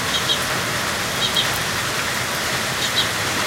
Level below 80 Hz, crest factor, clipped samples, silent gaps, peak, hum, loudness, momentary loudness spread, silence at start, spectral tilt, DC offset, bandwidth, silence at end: -46 dBFS; 18 dB; under 0.1%; none; -4 dBFS; none; -19 LUFS; 3 LU; 0 s; -1.5 dB/octave; under 0.1%; 16 kHz; 0 s